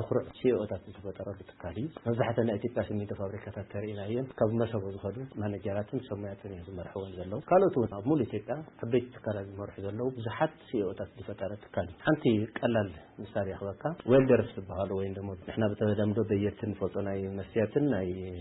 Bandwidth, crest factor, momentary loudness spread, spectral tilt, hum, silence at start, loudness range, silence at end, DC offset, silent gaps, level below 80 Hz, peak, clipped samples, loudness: 4.1 kHz; 18 dB; 13 LU; -11.5 dB/octave; none; 0 s; 5 LU; 0 s; under 0.1%; none; -60 dBFS; -14 dBFS; under 0.1%; -32 LUFS